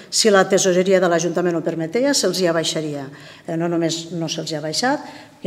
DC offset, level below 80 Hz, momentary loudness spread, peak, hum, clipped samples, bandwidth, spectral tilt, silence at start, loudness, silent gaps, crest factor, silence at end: under 0.1%; -68 dBFS; 14 LU; -2 dBFS; none; under 0.1%; 16 kHz; -3.5 dB/octave; 0 s; -19 LUFS; none; 18 dB; 0.2 s